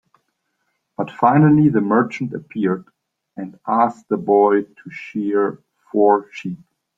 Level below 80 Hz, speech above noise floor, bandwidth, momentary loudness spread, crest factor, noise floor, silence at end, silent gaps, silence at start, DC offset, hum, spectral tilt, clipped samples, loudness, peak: -60 dBFS; 54 dB; 7.4 kHz; 20 LU; 18 dB; -72 dBFS; 0.4 s; none; 1 s; under 0.1%; none; -9.5 dB/octave; under 0.1%; -18 LUFS; -2 dBFS